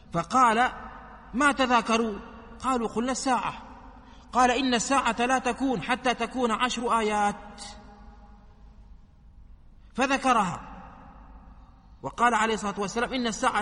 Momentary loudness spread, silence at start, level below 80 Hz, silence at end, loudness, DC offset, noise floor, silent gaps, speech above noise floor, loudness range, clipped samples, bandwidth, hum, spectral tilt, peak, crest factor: 19 LU; 0.1 s; -50 dBFS; 0 s; -25 LUFS; under 0.1%; -51 dBFS; none; 26 dB; 5 LU; under 0.1%; 11.5 kHz; none; -3.5 dB/octave; -8 dBFS; 20 dB